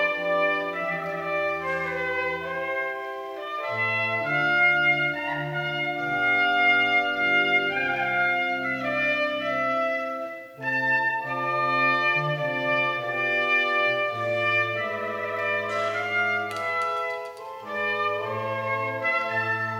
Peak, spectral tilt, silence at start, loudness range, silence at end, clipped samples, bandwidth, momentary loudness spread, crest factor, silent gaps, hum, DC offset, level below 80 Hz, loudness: -10 dBFS; -5 dB/octave; 0 s; 5 LU; 0 s; under 0.1%; 16 kHz; 9 LU; 14 dB; none; none; under 0.1%; -66 dBFS; -24 LUFS